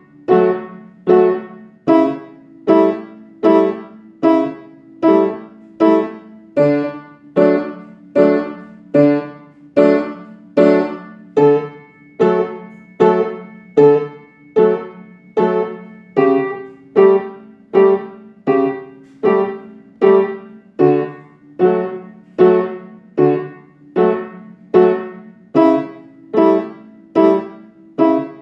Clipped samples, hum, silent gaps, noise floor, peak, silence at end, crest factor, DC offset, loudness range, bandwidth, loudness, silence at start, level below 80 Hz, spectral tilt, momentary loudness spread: under 0.1%; none; none; -40 dBFS; 0 dBFS; 0.1 s; 16 dB; under 0.1%; 1 LU; 6 kHz; -15 LUFS; 0.3 s; -66 dBFS; -9 dB/octave; 19 LU